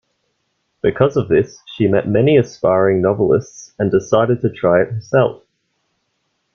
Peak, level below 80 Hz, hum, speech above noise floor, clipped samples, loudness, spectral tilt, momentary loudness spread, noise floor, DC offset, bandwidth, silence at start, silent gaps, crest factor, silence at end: 0 dBFS; -50 dBFS; none; 54 dB; under 0.1%; -16 LUFS; -7.5 dB/octave; 6 LU; -69 dBFS; under 0.1%; 7 kHz; 0.85 s; none; 16 dB; 1.2 s